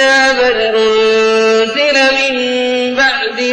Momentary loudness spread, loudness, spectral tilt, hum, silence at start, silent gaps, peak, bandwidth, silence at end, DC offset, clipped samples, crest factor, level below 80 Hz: 5 LU; -11 LUFS; -2 dB/octave; none; 0 s; none; -2 dBFS; 9.6 kHz; 0 s; under 0.1%; under 0.1%; 10 dB; -46 dBFS